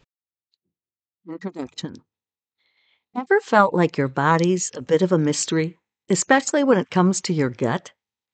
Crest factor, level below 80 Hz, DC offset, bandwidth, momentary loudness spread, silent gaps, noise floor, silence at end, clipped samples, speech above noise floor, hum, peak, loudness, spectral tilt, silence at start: 20 dB; -70 dBFS; under 0.1%; 9.4 kHz; 15 LU; none; under -90 dBFS; 0.45 s; under 0.1%; over 70 dB; none; -2 dBFS; -20 LUFS; -5 dB/octave; 1.25 s